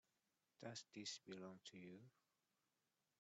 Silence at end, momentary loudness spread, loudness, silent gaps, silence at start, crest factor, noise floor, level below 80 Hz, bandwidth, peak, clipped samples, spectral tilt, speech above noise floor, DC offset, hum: 1.1 s; 9 LU; -56 LUFS; none; 0.6 s; 22 dB; under -90 dBFS; under -90 dBFS; 8.2 kHz; -38 dBFS; under 0.1%; -3 dB/octave; over 33 dB; under 0.1%; none